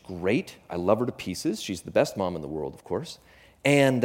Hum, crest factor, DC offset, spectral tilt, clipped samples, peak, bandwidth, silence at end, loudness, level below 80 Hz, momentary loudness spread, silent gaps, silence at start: none; 20 dB; under 0.1%; -5.5 dB/octave; under 0.1%; -6 dBFS; 16.5 kHz; 0 s; -27 LUFS; -58 dBFS; 12 LU; none; 0.05 s